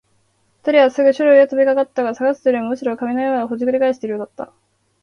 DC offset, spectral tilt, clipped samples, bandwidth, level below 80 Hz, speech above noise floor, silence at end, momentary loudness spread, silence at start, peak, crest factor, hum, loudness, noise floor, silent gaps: under 0.1%; -5.5 dB/octave; under 0.1%; 6.8 kHz; -66 dBFS; 45 dB; 0.6 s; 14 LU; 0.65 s; 0 dBFS; 16 dB; none; -17 LUFS; -61 dBFS; none